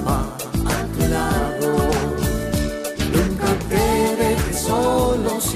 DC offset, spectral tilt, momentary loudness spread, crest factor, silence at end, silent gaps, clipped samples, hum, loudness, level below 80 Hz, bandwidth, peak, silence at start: under 0.1%; -5 dB/octave; 5 LU; 14 dB; 0 s; none; under 0.1%; none; -20 LUFS; -28 dBFS; 15.5 kHz; -6 dBFS; 0 s